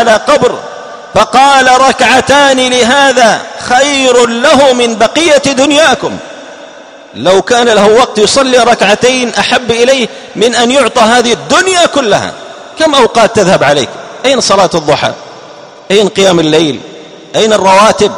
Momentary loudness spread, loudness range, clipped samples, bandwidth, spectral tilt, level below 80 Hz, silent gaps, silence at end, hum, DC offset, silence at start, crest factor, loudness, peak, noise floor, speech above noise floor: 9 LU; 3 LU; 3%; 16 kHz; -3 dB/octave; -42 dBFS; none; 0 s; none; 0.2%; 0 s; 8 dB; -7 LUFS; 0 dBFS; -31 dBFS; 24 dB